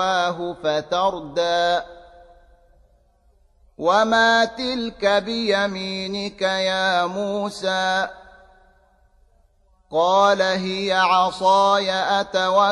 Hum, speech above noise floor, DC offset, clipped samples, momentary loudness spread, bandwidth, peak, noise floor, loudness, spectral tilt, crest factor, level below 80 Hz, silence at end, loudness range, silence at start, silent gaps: none; 39 dB; under 0.1%; under 0.1%; 9 LU; 11.5 kHz; -4 dBFS; -59 dBFS; -20 LUFS; -3.5 dB/octave; 16 dB; -56 dBFS; 0 s; 6 LU; 0 s; none